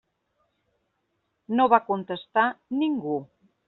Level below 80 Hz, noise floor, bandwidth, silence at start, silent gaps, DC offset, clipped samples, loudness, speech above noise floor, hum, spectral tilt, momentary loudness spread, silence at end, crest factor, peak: -72 dBFS; -76 dBFS; 4.2 kHz; 1.5 s; none; under 0.1%; under 0.1%; -25 LUFS; 52 dB; none; -3.5 dB/octave; 10 LU; 0.45 s; 22 dB; -4 dBFS